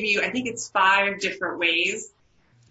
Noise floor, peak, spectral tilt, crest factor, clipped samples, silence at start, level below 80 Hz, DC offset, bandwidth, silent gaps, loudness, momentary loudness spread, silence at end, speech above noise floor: -60 dBFS; -8 dBFS; -2 dB/octave; 18 dB; under 0.1%; 0 s; -64 dBFS; under 0.1%; 8.2 kHz; none; -22 LUFS; 10 LU; 0.65 s; 36 dB